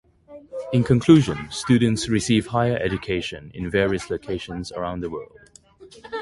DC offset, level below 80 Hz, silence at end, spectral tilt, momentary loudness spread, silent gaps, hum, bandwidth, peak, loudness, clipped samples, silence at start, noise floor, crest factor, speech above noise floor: under 0.1%; -46 dBFS; 0 s; -6 dB/octave; 16 LU; none; none; 11.5 kHz; -2 dBFS; -22 LUFS; under 0.1%; 0.3 s; -49 dBFS; 20 dB; 28 dB